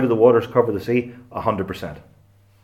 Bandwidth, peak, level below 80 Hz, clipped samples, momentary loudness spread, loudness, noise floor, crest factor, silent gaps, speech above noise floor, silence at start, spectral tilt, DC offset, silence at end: 14.5 kHz; -2 dBFS; -54 dBFS; under 0.1%; 17 LU; -20 LUFS; -54 dBFS; 20 dB; none; 34 dB; 0 s; -8 dB/octave; under 0.1%; 0.65 s